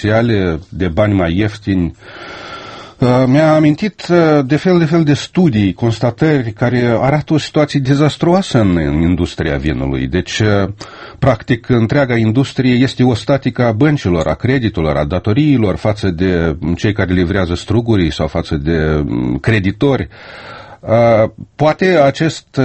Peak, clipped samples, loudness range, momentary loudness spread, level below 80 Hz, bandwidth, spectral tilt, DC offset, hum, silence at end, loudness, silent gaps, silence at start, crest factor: 0 dBFS; under 0.1%; 3 LU; 7 LU; -32 dBFS; 8.8 kHz; -7 dB/octave; under 0.1%; none; 0 s; -14 LUFS; none; 0 s; 14 dB